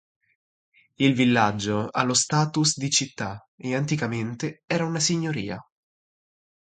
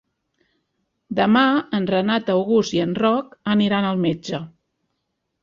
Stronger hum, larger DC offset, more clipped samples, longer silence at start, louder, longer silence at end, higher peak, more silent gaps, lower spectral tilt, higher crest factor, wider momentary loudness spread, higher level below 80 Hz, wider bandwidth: neither; neither; neither; about the same, 1 s vs 1.1 s; second, -24 LUFS vs -20 LUFS; about the same, 1.05 s vs 0.95 s; about the same, -6 dBFS vs -4 dBFS; first, 3.48-3.58 s, 4.64-4.68 s vs none; second, -4 dB/octave vs -6 dB/octave; about the same, 20 dB vs 18 dB; about the same, 13 LU vs 11 LU; about the same, -60 dBFS vs -60 dBFS; first, 9.6 kHz vs 7.4 kHz